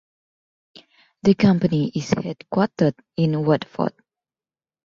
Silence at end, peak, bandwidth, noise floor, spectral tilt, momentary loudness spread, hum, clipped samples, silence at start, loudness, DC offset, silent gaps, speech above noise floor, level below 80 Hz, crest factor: 0.95 s; -2 dBFS; 7.4 kHz; under -90 dBFS; -7.5 dB/octave; 9 LU; none; under 0.1%; 1.25 s; -21 LUFS; under 0.1%; none; over 70 dB; -56 dBFS; 20 dB